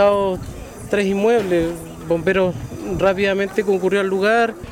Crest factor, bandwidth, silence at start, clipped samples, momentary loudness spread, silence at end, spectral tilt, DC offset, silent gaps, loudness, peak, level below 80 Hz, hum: 12 dB; 16.5 kHz; 0 s; under 0.1%; 11 LU; 0 s; -6 dB/octave; under 0.1%; none; -19 LUFS; -6 dBFS; -42 dBFS; none